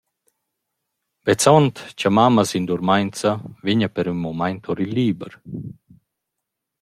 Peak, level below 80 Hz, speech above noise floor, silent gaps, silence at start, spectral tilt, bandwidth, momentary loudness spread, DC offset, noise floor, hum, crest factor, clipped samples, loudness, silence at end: -2 dBFS; -58 dBFS; 62 dB; none; 1.25 s; -5.5 dB/octave; 15.5 kHz; 17 LU; under 0.1%; -81 dBFS; none; 20 dB; under 0.1%; -20 LUFS; 1.1 s